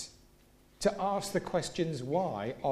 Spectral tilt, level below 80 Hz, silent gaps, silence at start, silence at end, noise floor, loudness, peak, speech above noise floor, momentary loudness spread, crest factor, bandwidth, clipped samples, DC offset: -5 dB/octave; -58 dBFS; none; 0 s; 0 s; -62 dBFS; -33 LUFS; -16 dBFS; 30 dB; 3 LU; 18 dB; 15.5 kHz; under 0.1%; under 0.1%